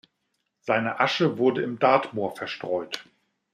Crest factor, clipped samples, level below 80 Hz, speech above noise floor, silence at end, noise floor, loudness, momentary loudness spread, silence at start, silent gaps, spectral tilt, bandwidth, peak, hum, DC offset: 20 dB; under 0.1%; -74 dBFS; 52 dB; 0.5 s; -77 dBFS; -25 LUFS; 13 LU; 0.65 s; none; -5.5 dB/octave; 14.5 kHz; -6 dBFS; none; under 0.1%